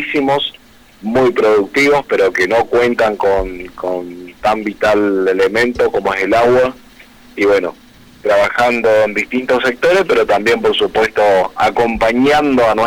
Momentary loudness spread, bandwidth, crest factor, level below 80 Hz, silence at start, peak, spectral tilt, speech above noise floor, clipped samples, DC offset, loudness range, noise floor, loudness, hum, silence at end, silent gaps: 8 LU; 16.5 kHz; 8 dB; -40 dBFS; 0 s; -6 dBFS; -4.5 dB/octave; 28 dB; under 0.1%; under 0.1%; 2 LU; -41 dBFS; -13 LUFS; none; 0 s; none